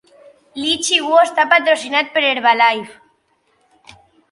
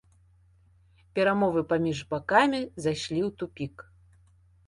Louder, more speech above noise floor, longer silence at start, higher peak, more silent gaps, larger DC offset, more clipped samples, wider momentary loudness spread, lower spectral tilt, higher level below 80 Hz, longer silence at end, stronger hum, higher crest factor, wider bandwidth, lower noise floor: first, -14 LUFS vs -27 LUFS; first, 47 dB vs 34 dB; second, 0.55 s vs 1.15 s; first, 0 dBFS vs -6 dBFS; neither; neither; neither; about the same, 11 LU vs 13 LU; second, -0.5 dB/octave vs -5.5 dB/octave; about the same, -64 dBFS vs -60 dBFS; first, 1.4 s vs 0.85 s; neither; about the same, 18 dB vs 22 dB; about the same, 11.5 kHz vs 11.5 kHz; about the same, -62 dBFS vs -61 dBFS